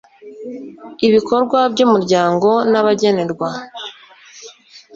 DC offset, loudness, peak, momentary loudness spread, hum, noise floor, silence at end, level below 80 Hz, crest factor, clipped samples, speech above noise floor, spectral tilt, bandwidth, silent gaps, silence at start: under 0.1%; -15 LUFS; -2 dBFS; 19 LU; none; -41 dBFS; 0.15 s; -58 dBFS; 14 dB; under 0.1%; 26 dB; -5.5 dB/octave; 7.8 kHz; none; 0.25 s